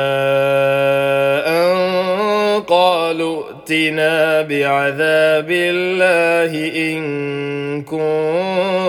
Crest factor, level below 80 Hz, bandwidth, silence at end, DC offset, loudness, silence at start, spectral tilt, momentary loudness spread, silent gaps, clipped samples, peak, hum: 14 dB; -64 dBFS; 18 kHz; 0 s; under 0.1%; -16 LUFS; 0 s; -5 dB/octave; 8 LU; none; under 0.1%; 0 dBFS; none